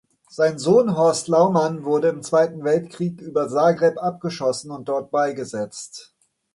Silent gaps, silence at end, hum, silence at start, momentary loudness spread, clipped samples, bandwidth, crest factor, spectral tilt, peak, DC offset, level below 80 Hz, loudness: none; 0.55 s; none; 0.35 s; 12 LU; under 0.1%; 11.5 kHz; 16 dB; -5.5 dB/octave; -4 dBFS; under 0.1%; -66 dBFS; -21 LUFS